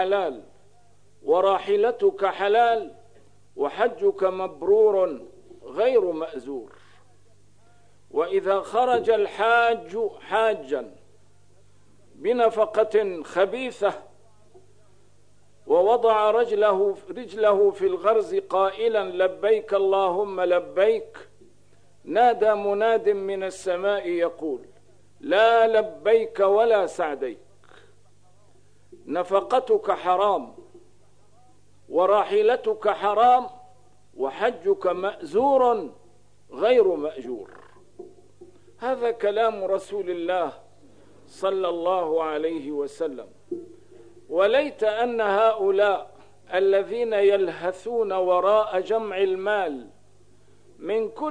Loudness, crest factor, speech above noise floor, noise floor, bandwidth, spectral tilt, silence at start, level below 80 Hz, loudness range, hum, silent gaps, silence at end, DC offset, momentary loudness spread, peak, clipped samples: -23 LUFS; 18 dB; 38 dB; -60 dBFS; 10 kHz; -5 dB/octave; 0 s; -66 dBFS; 5 LU; 50 Hz at -60 dBFS; none; 0 s; 0.3%; 12 LU; -6 dBFS; under 0.1%